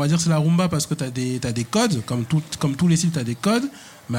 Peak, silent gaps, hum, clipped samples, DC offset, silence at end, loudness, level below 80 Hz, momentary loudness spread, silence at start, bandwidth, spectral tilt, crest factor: -8 dBFS; none; none; under 0.1%; under 0.1%; 0 s; -22 LUFS; -52 dBFS; 6 LU; 0 s; 16 kHz; -5.5 dB/octave; 14 dB